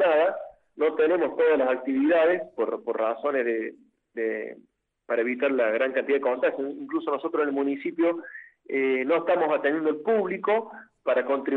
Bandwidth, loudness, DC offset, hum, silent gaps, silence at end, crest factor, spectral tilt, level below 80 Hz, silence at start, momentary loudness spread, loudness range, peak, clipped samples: 4.2 kHz; -25 LUFS; under 0.1%; none; none; 0 s; 14 dB; -7.5 dB/octave; -76 dBFS; 0 s; 11 LU; 3 LU; -10 dBFS; under 0.1%